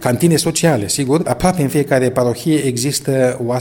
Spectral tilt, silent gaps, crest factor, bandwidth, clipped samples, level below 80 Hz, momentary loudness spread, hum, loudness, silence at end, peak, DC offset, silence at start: -5 dB/octave; none; 14 dB; 17.5 kHz; under 0.1%; -42 dBFS; 3 LU; none; -15 LUFS; 0 s; 0 dBFS; under 0.1%; 0 s